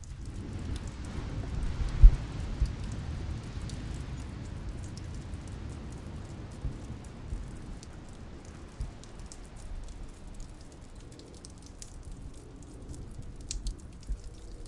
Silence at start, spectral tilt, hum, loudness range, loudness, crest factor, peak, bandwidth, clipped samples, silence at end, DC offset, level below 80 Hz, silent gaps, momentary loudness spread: 0 s; -6 dB/octave; none; 16 LU; -37 LUFS; 30 dB; -4 dBFS; 11 kHz; under 0.1%; 0 s; under 0.1%; -34 dBFS; none; 13 LU